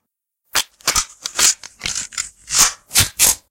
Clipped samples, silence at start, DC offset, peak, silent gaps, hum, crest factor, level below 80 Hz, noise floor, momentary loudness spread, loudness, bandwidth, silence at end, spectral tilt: under 0.1%; 0.55 s; under 0.1%; 0 dBFS; none; none; 20 dB; -42 dBFS; -72 dBFS; 11 LU; -16 LUFS; 17.5 kHz; 0.15 s; 0.5 dB/octave